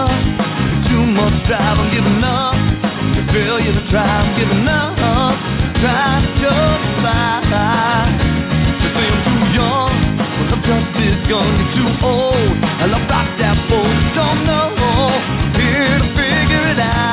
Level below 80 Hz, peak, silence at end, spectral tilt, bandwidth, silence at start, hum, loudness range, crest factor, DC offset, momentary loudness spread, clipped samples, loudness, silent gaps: -24 dBFS; -2 dBFS; 0 s; -10.5 dB/octave; 4 kHz; 0 s; none; 1 LU; 12 dB; under 0.1%; 3 LU; under 0.1%; -15 LUFS; none